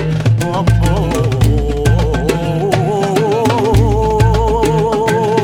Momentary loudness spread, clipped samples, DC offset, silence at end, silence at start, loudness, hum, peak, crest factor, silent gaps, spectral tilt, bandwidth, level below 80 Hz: 3 LU; under 0.1%; under 0.1%; 0 s; 0 s; -14 LUFS; none; 0 dBFS; 12 dB; none; -6.5 dB/octave; 15.5 kHz; -20 dBFS